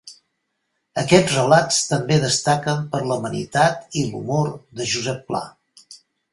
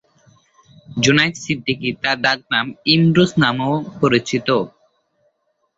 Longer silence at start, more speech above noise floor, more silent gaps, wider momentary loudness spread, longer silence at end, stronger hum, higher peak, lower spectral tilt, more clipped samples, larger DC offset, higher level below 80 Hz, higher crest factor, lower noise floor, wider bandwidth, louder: second, 0.05 s vs 0.9 s; first, 54 dB vs 50 dB; neither; first, 12 LU vs 8 LU; second, 0.35 s vs 1.1 s; neither; about the same, 0 dBFS vs 0 dBFS; about the same, -4 dB/octave vs -5 dB/octave; neither; neither; about the same, -56 dBFS vs -54 dBFS; about the same, 22 dB vs 18 dB; first, -74 dBFS vs -67 dBFS; first, 11.5 kHz vs 7.8 kHz; second, -20 LUFS vs -17 LUFS